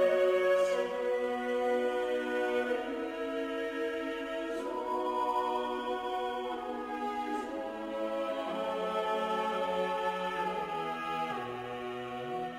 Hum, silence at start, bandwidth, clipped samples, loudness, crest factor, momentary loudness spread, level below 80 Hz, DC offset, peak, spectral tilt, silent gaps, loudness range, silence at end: none; 0 s; 16 kHz; under 0.1%; -33 LUFS; 16 dB; 7 LU; -66 dBFS; under 0.1%; -16 dBFS; -4.5 dB/octave; none; 3 LU; 0 s